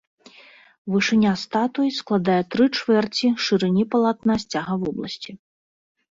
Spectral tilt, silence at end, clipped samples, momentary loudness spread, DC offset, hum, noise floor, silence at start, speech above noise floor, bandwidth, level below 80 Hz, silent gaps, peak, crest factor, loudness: -5.5 dB/octave; 0.75 s; under 0.1%; 10 LU; under 0.1%; none; -50 dBFS; 0.85 s; 29 dB; 7.8 kHz; -58 dBFS; none; -8 dBFS; 14 dB; -21 LUFS